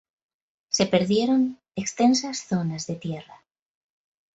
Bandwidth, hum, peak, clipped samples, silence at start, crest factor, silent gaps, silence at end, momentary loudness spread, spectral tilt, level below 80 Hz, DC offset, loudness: 8.2 kHz; none; -6 dBFS; under 0.1%; 0.7 s; 20 dB; none; 1 s; 11 LU; -4.5 dB/octave; -64 dBFS; under 0.1%; -24 LUFS